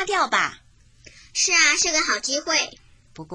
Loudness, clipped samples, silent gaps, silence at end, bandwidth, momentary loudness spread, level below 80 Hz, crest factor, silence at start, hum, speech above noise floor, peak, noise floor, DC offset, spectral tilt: -20 LUFS; under 0.1%; none; 0.1 s; 10.5 kHz; 11 LU; -54 dBFS; 18 dB; 0 s; none; 30 dB; -6 dBFS; -51 dBFS; under 0.1%; 0.5 dB/octave